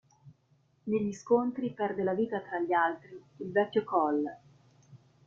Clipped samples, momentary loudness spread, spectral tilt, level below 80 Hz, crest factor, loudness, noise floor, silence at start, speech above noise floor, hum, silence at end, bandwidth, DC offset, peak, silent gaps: under 0.1%; 12 LU; -6.5 dB/octave; -74 dBFS; 20 dB; -31 LUFS; -69 dBFS; 0.25 s; 38 dB; none; 0.3 s; 7.6 kHz; under 0.1%; -12 dBFS; none